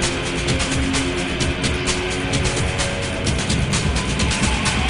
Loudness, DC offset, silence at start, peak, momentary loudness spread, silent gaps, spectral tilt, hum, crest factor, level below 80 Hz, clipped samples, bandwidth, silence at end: -20 LUFS; under 0.1%; 0 s; -6 dBFS; 3 LU; none; -4 dB/octave; none; 14 dB; -28 dBFS; under 0.1%; 11.5 kHz; 0 s